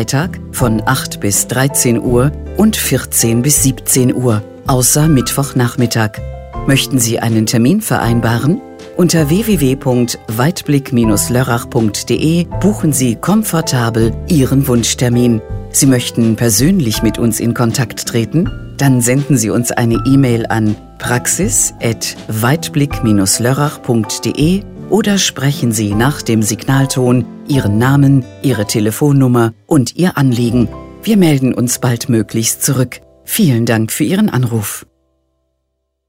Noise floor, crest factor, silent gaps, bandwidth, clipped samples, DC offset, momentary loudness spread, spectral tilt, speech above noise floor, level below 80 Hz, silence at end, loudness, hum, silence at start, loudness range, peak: -69 dBFS; 12 dB; none; 16.5 kHz; under 0.1%; 0.3%; 6 LU; -5 dB/octave; 57 dB; -32 dBFS; 1.3 s; -13 LUFS; none; 0 s; 2 LU; 0 dBFS